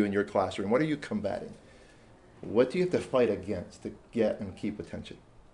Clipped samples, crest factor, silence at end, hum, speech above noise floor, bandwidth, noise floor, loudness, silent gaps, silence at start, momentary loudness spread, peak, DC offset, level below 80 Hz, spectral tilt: under 0.1%; 18 dB; 0.35 s; none; 26 dB; 11 kHz; -56 dBFS; -30 LUFS; none; 0 s; 16 LU; -12 dBFS; under 0.1%; -62 dBFS; -6.5 dB/octave